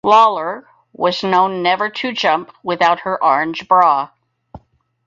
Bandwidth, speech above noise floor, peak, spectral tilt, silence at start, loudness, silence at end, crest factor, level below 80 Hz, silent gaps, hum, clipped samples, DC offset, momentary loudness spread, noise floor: 7.6 kHz; 35 dB; 0 dBFS; -4.5 dB/octave; 0.05 s; -16 LUFS; 0.5 s; 16 dB; -58 dBFS; none; none; under 0.1%; under 0.1%; 11 LU; -50 dBFS